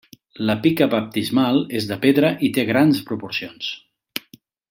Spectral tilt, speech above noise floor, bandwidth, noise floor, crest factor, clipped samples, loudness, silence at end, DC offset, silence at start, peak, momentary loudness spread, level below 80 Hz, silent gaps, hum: -6 dB/octave; 32 dB; 16.5 kHz; -51 dBFS; 18 dB; under 0.1%; -20 LUFS; 0.5 s; under 0.1%; 0.4 s; -2 dBFS; 15 LU; -62 dBFS; none; none